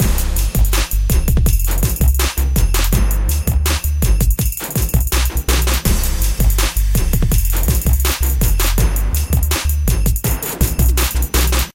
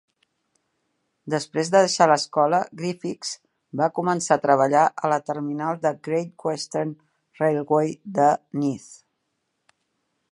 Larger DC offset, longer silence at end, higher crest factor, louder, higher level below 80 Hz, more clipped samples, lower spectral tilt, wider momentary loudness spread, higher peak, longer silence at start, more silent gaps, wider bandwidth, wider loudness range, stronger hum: neither; second, 0.05 s vs 1.4 s; second, 12 dB vs 22 dB; first, -17 LUFS vs -23 LUFS; first, -16 dBFS vs -74 dBFS; neither; about the same, -4 dB/octave vs -4.5 dB/octave; second, 2 LU vs 11 LU; about the same, -2 dBFS vs -2 dBFS; second, 0 s vs 1.25 s; neither; first, 17.5 kHz vs 11.5 kHz; second, 1 LU vs 4 LU; neither